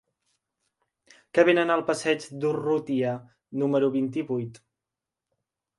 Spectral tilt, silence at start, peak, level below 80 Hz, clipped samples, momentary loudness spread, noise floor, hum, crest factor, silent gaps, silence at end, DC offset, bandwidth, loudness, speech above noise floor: -5.5 dB/octave; 1.35 s; -8 dBFS; -74 dBFS; under 0.1%; 11 LU; -88 dBFS; none; 20 dB; none; 1.2 s; under 0.1%; 11.5 kHz; -25 LUFS; 63 dB